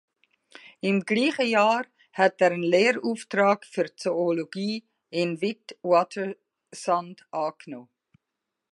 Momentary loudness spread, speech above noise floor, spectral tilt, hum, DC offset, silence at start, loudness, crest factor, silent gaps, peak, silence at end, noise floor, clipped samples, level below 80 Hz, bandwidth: 14 LU; 59 dB; -5 dB/octave; none; under 0.1%; 0.85 s; -25 LUFS; 22 dB; none; -6 dBFS; 0.9 s; -84 dBFS; under 0.1%; -80 dBFS; 11.5 kHz